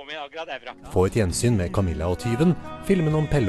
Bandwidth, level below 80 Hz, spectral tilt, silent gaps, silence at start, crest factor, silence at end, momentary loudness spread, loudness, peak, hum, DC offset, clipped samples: 13 kHz; -38 dBFS; -6.5 dB/octave; none; 0 s; 14 dB; 0 s; 12 LU; -24 LUFS; -8 dBFS; none; under 0.1%; under 0.1%